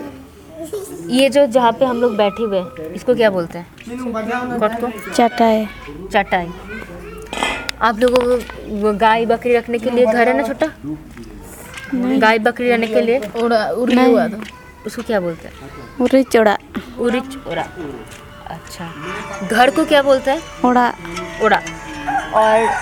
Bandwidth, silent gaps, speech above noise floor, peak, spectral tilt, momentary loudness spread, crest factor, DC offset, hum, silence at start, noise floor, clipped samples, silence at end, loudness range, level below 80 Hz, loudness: 18.5 kHz; none; 20 dB; 0 dBFS; -5 dB/octave; 18 LU; 18 dB; under 0.1%; none; 0 s; -37 dBFS; under 0.1%; 0 s; 3 LU; -44 dBFS; -16 LUFS